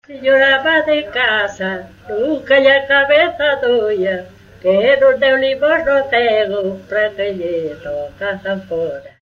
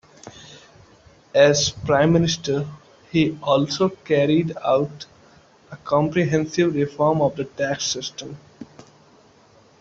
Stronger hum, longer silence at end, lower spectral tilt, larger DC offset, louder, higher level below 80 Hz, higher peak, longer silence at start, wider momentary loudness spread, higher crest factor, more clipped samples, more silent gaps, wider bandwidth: neither; second, 0.15 s vs 1.15 s; about the same, -5 dB/octave vs -5 dB/octave; neither; first, -15 LUFS vs -20 LUFS; about the same, -50 dBFS vs -54 dBFS; first, 0 dBFS vs -4 dBFS; second, 0.1 s vs 0.25 s; second, 12 LU vs 19 LU; about the same, 14 dB vs 18 dB; neither; neither; about the same, 7.2 kHz vs 7.8 kHz